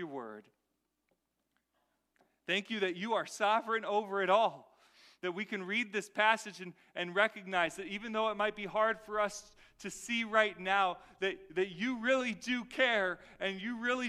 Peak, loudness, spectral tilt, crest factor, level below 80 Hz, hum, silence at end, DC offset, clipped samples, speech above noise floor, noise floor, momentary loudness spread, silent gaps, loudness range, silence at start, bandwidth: -14 dBFS; -33 LUFS; -3.5 dB/octave; 22 dB; -72 dBFS; none; 0 s; under 0.1%; under 0.1%; 49 dB; -83 dBFS; 13 LU; none; 3 LU; 0 s; 14.5 kHz